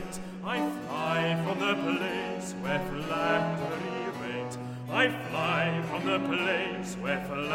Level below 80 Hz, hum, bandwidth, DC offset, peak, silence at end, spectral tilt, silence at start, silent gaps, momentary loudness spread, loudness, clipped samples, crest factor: -58 dBFS; none; 16.5 kHz; under 0.1%; -12 dBFS; 0 s; -5 dB/octave; 0 s; none; 8 LU; -30 LUFS; under 0.1%; 18 dB